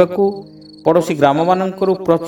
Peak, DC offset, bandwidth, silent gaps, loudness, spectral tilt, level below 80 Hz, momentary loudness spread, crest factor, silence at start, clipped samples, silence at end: 0 dBFS; under 0.1%; 18 kHz; none; -15 LUFS; -7 dB/octave; -56 dBFS; 6 LU; 16 dB; 0 s; under 0.1%; 0 s